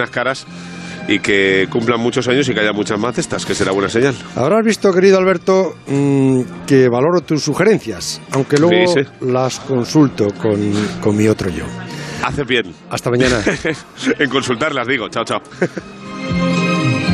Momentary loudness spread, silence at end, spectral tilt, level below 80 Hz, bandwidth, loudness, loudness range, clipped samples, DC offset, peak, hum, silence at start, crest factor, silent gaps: 10 LU; 0 s; -5.5 dB/octave; -44 dBFS; 13.5 kHz; -15 LUFS; 4 LU; under 0.1%; under 0.1%; 0 dBFS; none; 0 s; 16 dB; none